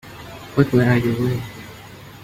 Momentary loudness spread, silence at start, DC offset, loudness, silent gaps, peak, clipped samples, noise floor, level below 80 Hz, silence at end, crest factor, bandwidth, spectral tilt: 22 LU; 0.05 s; under 0.1%; -19 LUFS; none; -2 dBFS; under 0.1%; -40 dBFS; -46 dBFS; 0.05 s; 20 dB; 16 kHz; -7.5 dB/octave